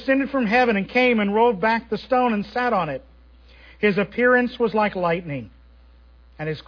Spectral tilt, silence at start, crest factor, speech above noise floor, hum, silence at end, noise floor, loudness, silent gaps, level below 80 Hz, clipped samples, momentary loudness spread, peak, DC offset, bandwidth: -7.5 dB/octave; 0 s; 16 dB; 29 dB; none; 0.05 s; -50 dBFS; -21 LUFS; none; -50 dBFS; under 0.1%; 11 LU; -6 dBFS; under 0.1%; 5.4 kHz